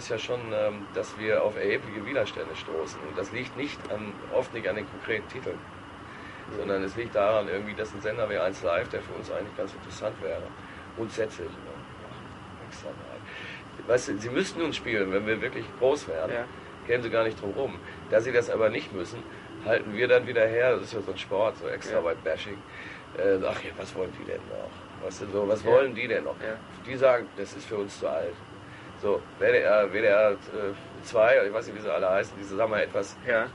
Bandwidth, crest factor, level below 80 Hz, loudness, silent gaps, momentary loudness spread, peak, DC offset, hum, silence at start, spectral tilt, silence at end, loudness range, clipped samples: 11.5 kHz; 20 dB; -56 dBFS; -28 LUFS; none; 17 LU; -8 dBFS; under 0.1%; none; 0 s; -5 dB/octave; 0 s; 8 LU; under 0.1%